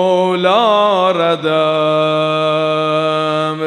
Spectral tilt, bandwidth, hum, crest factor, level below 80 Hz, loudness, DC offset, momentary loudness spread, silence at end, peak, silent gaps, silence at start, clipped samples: -6 dB/octave; 10.5 kHz; none; 14 dB; -68 dBFS; -14 LUFS; under 0.1%; 3 LU; 0 s; 0 dBFS; none; 0 s; under 0.1%